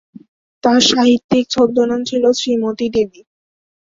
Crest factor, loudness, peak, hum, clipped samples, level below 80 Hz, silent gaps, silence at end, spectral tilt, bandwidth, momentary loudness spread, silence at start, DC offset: 14 dB; -15 LUFS; -2 dBFS; none; under 0.1%; -52 dBFS; 1.24-1.29 s; 0.9 s; -3.5 dB/octave; 7.8 kHz; 7 LU; 0.65 s; under 0.1%